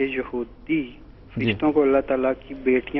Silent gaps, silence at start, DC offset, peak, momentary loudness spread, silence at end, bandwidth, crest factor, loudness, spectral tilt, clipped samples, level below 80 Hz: none; 0 s; under 0.1%; -8 dBFS; 12 LU; 0 s; 5.6 kHz; 16 dB; -23 LUFS; -9.5 dB/octave; under 0.1%; -46 dBFS